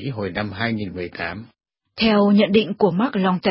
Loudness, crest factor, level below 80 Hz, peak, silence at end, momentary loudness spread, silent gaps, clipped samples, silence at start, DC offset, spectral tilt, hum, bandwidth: -20 LUFS; 16 dB; -50 dBFS; -4 dBFS; 0 s; 14 LU; none; under 0.1%; 0 s; under 0.1%; -11 dB/octave; none; 5.8 kHz